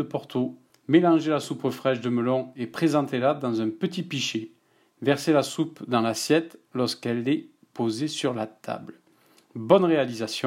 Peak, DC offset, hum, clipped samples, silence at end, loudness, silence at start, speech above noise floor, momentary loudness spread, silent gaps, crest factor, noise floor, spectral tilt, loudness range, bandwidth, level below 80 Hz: -4 dBFS; under 0.1%; none; under 0.1%; 0 s; -25 LUFS; 0 s; 36 dB; 13 LU; none; 22 dB; -60 dBFS; -5.5 dB/octave; 3 LU; 16 kHz; -76 dBFS